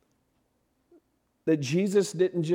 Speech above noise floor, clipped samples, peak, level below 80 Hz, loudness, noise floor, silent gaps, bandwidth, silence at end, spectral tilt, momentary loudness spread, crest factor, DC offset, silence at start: 48 dB; under 0.1%; -12 dBFS; -76 dBFS; -27 LUFS; -73 dBFS; none; 16 kHz; 0 s; -6 dB/octave; 4 LU; 16 dB; under 0.1%; 1.45 s